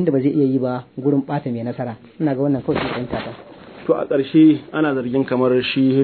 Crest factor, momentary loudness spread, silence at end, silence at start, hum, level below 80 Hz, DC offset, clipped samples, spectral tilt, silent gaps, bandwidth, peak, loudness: 14 dB; 13 LU; 0 s; 0 s; none; -54 dBFS; under 0.1%; under 0.1%; -11 dB/octave; none; 4.5 kHz; -4 dBFS; -19 LUFS